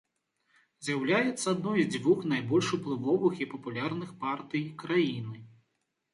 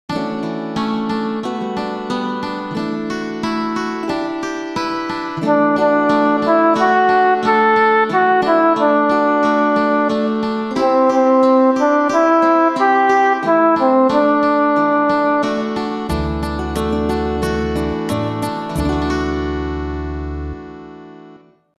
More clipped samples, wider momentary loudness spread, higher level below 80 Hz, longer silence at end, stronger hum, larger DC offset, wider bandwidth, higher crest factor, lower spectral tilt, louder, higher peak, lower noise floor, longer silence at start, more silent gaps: neither; about the same, 9 LU vs 10 LU; second, -72 dBFS vs -34 dBFS; first, 0.65 s vs 0.45 s; neither; neither; second, 11.5 kHz vs 13.5 kHz; about the same, 16 dB vs 14 dB; about the same, -5.5 dB/octave vs -6.5 dB/octave; second, -30 LUFS vs -16 LUFS; second, -14 dBFS vs -2 dBFS; first, -80 dBFS vs -44 dBFS; first, 0.8 s vs 0.1 s; neither